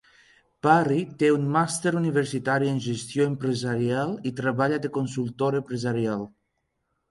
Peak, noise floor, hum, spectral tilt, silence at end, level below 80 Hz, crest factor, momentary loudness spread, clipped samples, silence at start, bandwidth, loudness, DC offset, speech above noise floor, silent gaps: -4 dBFS; -76 dBFS; none; -6 dB/octave; 0.85 s; -64 dBFS; 22 dB; 8 LU; under 0.1%; 0.65 s; 11.5 kHz; -25 LUFS; under 0.1%; 52 dB; none